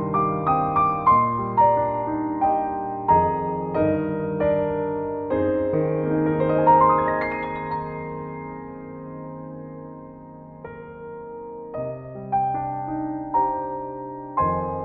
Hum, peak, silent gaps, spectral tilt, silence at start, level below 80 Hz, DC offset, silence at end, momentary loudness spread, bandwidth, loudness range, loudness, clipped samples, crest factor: none; -6 dBFS; none; -11.5 dB/octave; 0 s; -50 dBFS; under 0.1%; 0 s; 19 LU; 4.5 kHz; 15 LU; -22 LUFS; under 0.1%; 18 dB